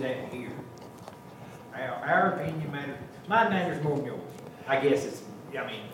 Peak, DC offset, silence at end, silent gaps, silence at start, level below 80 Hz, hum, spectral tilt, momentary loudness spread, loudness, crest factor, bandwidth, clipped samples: -10 dBFS; under 0.1%; 0 s; none; 0 s; -68 dBFS; none; -6 dB/octave; 21 LU; -29 LUFS; 20 dB; 16.5 kHz; under 0.1%